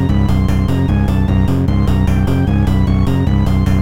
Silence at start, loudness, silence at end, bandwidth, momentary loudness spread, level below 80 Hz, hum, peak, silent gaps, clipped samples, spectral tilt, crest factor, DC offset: 0 s; -14 LUFS; 0 s; 15.5 kHz; 1 LU; -18 dBFS; none; -2 dBFS; none; under 0.1%; -8.5 dB/octave; 10 dB; 3%